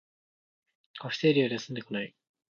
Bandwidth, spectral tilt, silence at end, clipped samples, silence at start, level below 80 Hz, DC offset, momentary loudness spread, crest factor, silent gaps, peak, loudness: 7.2 kHz; -6 dB/octave; 0.45 s; under 0.1%; 0.95 s; -76 dBFS; under 0.1%; 17 LU; 20 dB; none; -12 dBFS; -29 LUFS